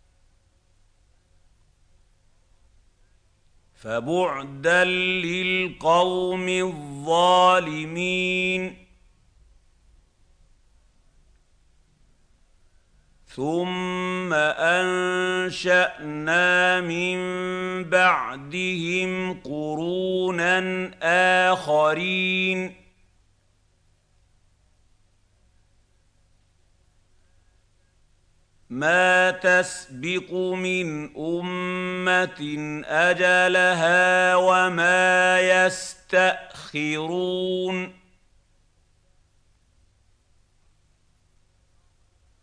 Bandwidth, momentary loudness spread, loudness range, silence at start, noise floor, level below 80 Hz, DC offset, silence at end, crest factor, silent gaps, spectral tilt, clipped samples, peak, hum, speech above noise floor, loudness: 10.5 kHz; 12 LU; 12 LU; 3.85 s; -63 dBFS; -60 dBFS; under 0.1%; 4.5 s; 20 dB; none; -4 dB/octave; under 0.1%; -6 dBFS; none; 41 dB; -22 LUFS